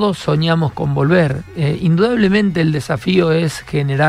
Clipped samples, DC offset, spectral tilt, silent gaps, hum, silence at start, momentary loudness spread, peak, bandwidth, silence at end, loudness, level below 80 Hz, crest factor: under 0.1%; under 0.1%; -7 dB/octave; none; none; 0 s; 6 LU; -2 dBFS; 12.5 kHz; 0 s; -16 LUFS; -42 dBFS; 14 dB